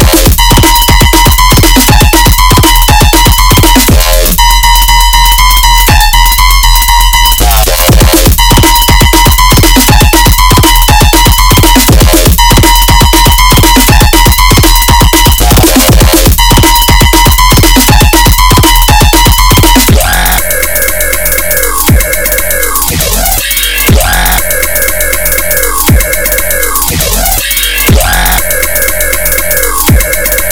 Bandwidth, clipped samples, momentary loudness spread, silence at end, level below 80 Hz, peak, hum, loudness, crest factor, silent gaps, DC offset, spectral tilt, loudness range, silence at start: over 20 kHz; 10%; 4 LU; 0 s; -8 dBFS; 0 dBFS; none; -4 LUFS; 4 dB; none; under 0.1%; -3 dB/octave; 3 LU; 0 s